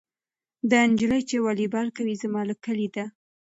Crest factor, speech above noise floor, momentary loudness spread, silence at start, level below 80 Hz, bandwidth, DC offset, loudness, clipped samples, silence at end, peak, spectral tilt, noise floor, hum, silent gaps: 18 dB; over 66 dB; 11 LU; 0.65 s; -64 dBFS; 8 kHz; under 0.1%; -25 LUFS; under 0.1%; 0.5 s; -8 dBFS; -5 dB/octave; under -90 dBFS; none; none